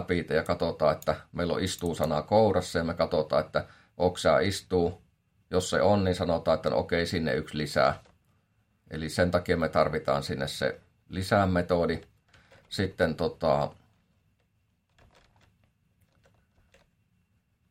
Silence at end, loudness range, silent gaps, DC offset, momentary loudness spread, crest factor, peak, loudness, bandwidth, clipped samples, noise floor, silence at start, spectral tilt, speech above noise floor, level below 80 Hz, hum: 3.95 s; 6 LU; none; under 0.1%; 8 LU; 20 dB; -8 dBFS; -28 LUFS; 16 kHz; under 0.1%; -72 dBFS; 0 s; -5.5 dB/octave; 45 dB; -56 dBFS; none